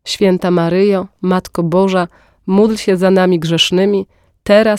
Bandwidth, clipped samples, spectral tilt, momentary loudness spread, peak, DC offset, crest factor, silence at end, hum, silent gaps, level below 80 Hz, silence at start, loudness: 14 kHz; under 0.1%; -5.5 dB/octave; 8 LU; 0 dBFS; under 0.1%; 12 dB; 0 s; none; none; -48 dBFS; 0.05 s; -13 LUFS